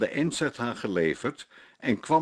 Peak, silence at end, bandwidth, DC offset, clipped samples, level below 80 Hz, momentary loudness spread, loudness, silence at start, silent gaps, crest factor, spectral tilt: -10 dBFS; 0 s; 12.5 kHz; under 0.1%; under 0.1%; -64 dBFS; 10 LU; -29 LUFS; 0 s; none; 18 dB; -5 dB/octave